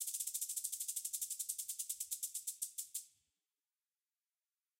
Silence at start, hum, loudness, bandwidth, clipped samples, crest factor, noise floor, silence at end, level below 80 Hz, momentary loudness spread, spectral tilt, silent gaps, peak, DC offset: 0 s; none; -41 LUFS; 17 kHz; under 0.1%; 22 dB; under -90 dBFS; 1.7 s; under -90 dBFS; 4 LU; 5.5 dB/octave; none; -24 dBFS; under 0.1%